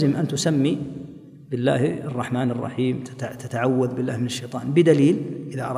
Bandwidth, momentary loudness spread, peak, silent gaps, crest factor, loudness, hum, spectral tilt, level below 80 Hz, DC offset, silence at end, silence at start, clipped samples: 15 kHz; 14 LU; -4 dBFS; none; 18 dB; -23 LUFS; none; -6.5 dB/octave; -62 dBFS; under 0.1%; 0 s; 0 s; under 0.1%